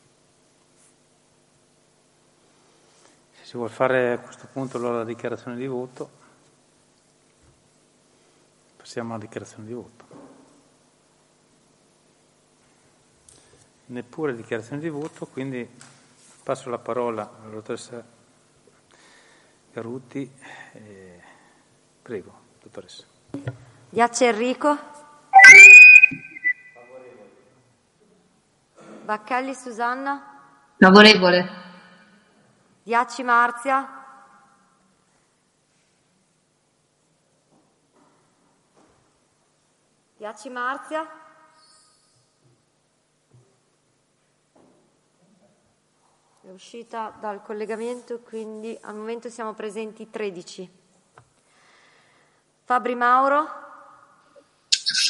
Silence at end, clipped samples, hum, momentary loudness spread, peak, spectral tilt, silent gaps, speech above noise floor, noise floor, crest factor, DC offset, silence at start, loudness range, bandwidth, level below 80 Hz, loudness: 0 s; under 0.1%; none; 27 LU; 0 dBFS; -3 dB/octave; none; 43 dB; -67 dBFS; 22 dB; under 0.1%; 3.55 s; 30 LU; 11.5 kHz; -68 dBFS; -13 LUFS